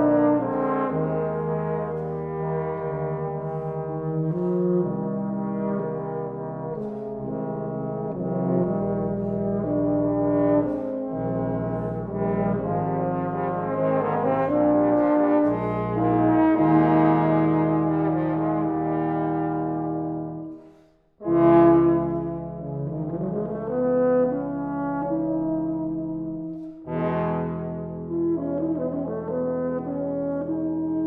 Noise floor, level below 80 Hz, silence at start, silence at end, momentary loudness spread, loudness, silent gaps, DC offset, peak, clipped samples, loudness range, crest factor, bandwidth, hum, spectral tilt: -56 dBFS; -50 dBFS; 0 s; 0 s; 11 LU; -24 LUFS; none; under 0.1%; -6 dBFS; under 0.1%; 7 LU; 18 dB; 4 kHz; none; -12 dB/octave